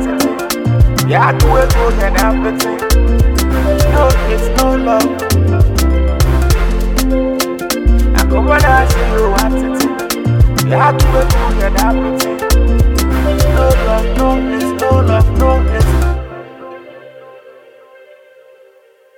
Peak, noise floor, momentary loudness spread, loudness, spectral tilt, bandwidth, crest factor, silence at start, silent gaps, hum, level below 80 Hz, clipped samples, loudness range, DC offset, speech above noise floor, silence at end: 0 dBFS; -47 dBFS; 5 LU; -13 LUFS; -5.5 dB/octave; 18 kHz; 12 dB; 0 s; none; none; -14 dBFS; under 0.1%; 3 LU; under 0.1%; 36 dB; 1.65 s